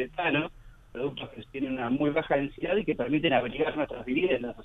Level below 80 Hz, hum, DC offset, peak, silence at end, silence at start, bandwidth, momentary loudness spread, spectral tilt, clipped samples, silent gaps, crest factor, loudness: -52 dBFS; none; under 0.1%; -12 dBFS; 0 s; 0 s; 4 kHz; 9 LU; -8 dB/octave; under 0.1%; none; 18 dB; -29 LUFS